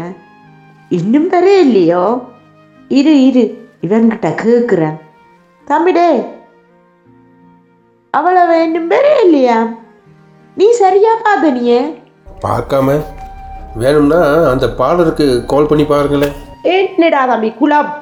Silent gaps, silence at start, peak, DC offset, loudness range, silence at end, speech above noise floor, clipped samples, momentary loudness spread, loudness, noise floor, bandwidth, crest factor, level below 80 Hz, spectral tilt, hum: none; 0 s; 0 dBFS; under 0.1%; 4 LU; 0 s; 40 dB; under 0.1%; 12 LU; -11 LUFS; -50 dBFS; 19 kHz; 12 dB; -38 dBFS; -6.5 dB/octave; none